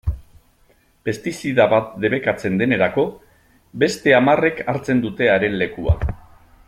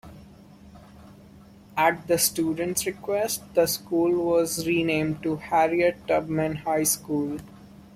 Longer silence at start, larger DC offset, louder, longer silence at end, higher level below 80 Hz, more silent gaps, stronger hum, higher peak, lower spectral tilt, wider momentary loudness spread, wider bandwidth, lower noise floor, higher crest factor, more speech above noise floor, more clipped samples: about the same, 0.05 s vs 0.05 s; neither; first, -19 LUFS vs -24 LUFS; first, 0.5 s vs 0.15 s; first, -36 dBFS vs -56 dBFS; neither; neither; first, -2 dBFS vs -8 dBFS; first, -6 dB/octave vs -4 dB/octave; first, 13 LU vs 6 LU; about the same, 15 kHz vs 16.5 kHz; first, -57 dBFS vs -49 dBFS; about the same, 18 dB vs 18 dB; first, 39 dB vs 25 dB; neither